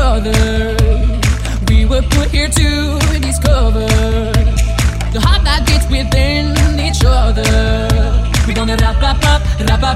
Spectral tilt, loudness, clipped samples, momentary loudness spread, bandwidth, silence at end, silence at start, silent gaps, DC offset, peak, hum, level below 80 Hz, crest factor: -5 dB/octave; -13 LUFS; under 0.1%; 2 LU; 15 kHz; 0 s; 0 s; none; under 0.1%; 0 dBFS; none; -14 dBFS; 12 dB